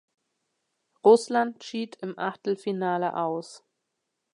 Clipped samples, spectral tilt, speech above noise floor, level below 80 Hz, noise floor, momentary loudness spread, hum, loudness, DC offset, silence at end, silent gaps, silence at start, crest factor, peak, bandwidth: under 0.1%; -5.5 dB/octave; 56 dB; -84 dBFS; -81 dBFS; 15 LU; none; -26 LUFS; under 0.1%; 0.75 s; none; 1.05 s; 22 dB; -6 dBFS; 11 kHz